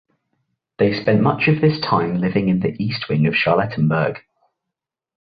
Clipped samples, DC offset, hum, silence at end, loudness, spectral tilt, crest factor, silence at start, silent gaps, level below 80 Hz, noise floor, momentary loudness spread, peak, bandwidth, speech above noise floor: under 0.1%; under 0.1%; none; 1.1 s; -18 LUFS; -9.5 dB/octave; 18 dB; 0.8 s; none; -52 dBFS; -84 dBFS; 6 LU; -2 dBFS; 5 kHz; 66 dB